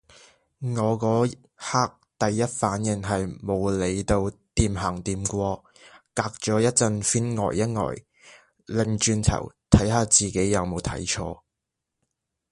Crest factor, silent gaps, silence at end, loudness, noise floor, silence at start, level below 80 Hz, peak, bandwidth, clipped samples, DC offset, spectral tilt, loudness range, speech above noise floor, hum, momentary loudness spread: 24 dB; none; 1.15 s; -24 LUFS; -84 dBFS; 0.6 s; -40 dBFS; 0 dBFS; 11.5 kHz; under 0.1%; under 0.1%; -4.5 dB/octave; 3 LU; 59 dB; none; 10 LU